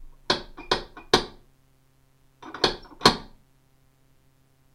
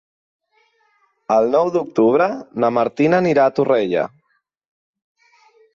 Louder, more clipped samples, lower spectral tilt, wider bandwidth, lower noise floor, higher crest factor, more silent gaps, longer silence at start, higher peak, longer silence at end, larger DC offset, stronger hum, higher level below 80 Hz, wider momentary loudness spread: second, -25 LUFS vs -17 LUFS; neither; second, -3 dB/octave vs -7.5 dB/octave; first, 16 kHz vs 7.4 kHz; second, -62 dBFS vs -67 dBFS; first, 30 dB vs 16 dB; neither; second, 0 s vs 1.3 s; first, 0 dBFS vs -4 dBFS; second, 1.45 s vs 1.7 s; neither; neither; first, -48 dBFS vs -64 dBFS; first, 18 LU vs 6 LU